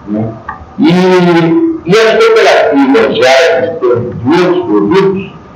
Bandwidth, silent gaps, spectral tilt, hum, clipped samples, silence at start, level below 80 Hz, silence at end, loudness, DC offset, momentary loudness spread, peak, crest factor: 13 kHz; none; -6 dB/octave; none; 1%; 0 s; -44 dBFS; 0.15 s; -8 LUFS; under 0.1%; 10 LU; 0 dBFS; 8 dB